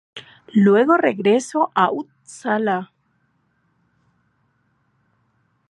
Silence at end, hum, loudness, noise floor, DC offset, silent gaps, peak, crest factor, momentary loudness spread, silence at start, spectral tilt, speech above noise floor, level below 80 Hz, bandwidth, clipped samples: 2.85 s; none; -18 LUFS; -66 dBFS; under 0.1%; none; -2 dBFS; 20 dB; 23 LU; 0.15 s; -6 dB/octave; 48 dB; -74 dBFS; 11.5 kHz; under 0.1%